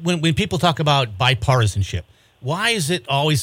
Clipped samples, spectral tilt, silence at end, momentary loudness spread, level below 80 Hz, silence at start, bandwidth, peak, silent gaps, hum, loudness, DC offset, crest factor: under 0.1%; -4.5 dB/octave; 0 s; 10 LU; -42 dBFS; 0 s; 16.5 kHz; -4 dBFS; none; none; -19 LUFS; under 0.1%; 16 dB